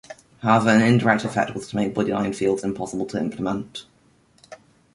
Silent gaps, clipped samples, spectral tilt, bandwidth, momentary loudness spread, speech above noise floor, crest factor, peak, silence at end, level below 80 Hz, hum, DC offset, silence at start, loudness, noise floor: none; under 0.1%; -6 dB/octave; 11.5 kHz; 11 LU; 37 dB; 20 dB; -2 dBFS; 0.4 s; -56 dBFS; none; under 0.1%; 0.1 s; -22 LUFS; -58 dBFS